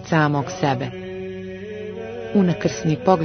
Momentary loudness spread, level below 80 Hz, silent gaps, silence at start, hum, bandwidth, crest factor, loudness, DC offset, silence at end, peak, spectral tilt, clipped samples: 13 LU; -52 dBFS; none; 0 s; none; 6.6 kHz; 20 dB; -23 LUFS; under 0.1%; 0 s; -2 dBFS; -6.5 dB/octave; under 0.1%